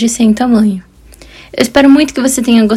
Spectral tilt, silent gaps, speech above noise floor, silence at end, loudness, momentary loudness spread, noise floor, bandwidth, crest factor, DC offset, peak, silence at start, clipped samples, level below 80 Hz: -4.5 dB/octave; none; 28 dB; 0 s; -10 LUFS; 10 LU; -37 dBFS; 15.5 kHz; 10 dB; under 0.1%; 0 dBFS; 0 s; 2%; -40 dBFS